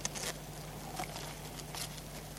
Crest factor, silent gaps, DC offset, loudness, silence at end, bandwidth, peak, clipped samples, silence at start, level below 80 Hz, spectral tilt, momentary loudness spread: 28 dB; none; under 0.1%; -42 LUFS; 0 s; 17 kHz; -16 dBFS; under 0.1%; 0 s; -54 dBFS; -3 dB/octave; 5 LU